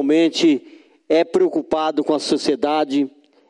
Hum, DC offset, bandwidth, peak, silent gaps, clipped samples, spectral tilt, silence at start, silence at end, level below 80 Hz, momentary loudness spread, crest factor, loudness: none; under 0.1%; 11 kHz; -6 dBFS; none; under 0.1%; -4.5 dB/octave; 0 s; 0.4 s; -62 dBFS; 5 LU; 12 dB; -19 LUFS